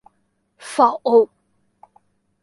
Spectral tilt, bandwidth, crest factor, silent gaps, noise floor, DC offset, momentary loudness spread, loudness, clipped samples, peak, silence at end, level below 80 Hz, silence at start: -4 dB/octave; 11.5 kHz; 20 dB; none; -68 dBFS; under 0.1%; 14 LU; -18 LUFS; under 0.1%; -2 dBFS; 1.2 s; -74 dBFS; 0.65 s